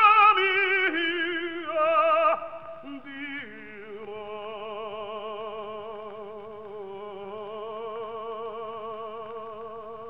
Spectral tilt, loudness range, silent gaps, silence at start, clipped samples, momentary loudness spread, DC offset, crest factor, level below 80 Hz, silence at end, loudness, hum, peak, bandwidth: -5.5 dB/octave; 12 LU; none; 0 s; under 0.1%; 19 LU; 0.2%; 20 dB; -68 dBFS; 0 s; -26 LUFS; none; -8 dBFS; 5.6 kHz